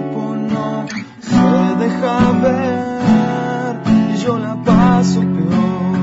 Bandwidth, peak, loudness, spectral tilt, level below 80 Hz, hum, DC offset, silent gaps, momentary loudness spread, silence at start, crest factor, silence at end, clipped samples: 7.8 kHz; -2 dBFS; -15 LUFS; -7.5 dB/octave; -40 dBFS; none; under 0.1%; none; 8 LU; 0 s; 12 dB; 0 s; under 0.1%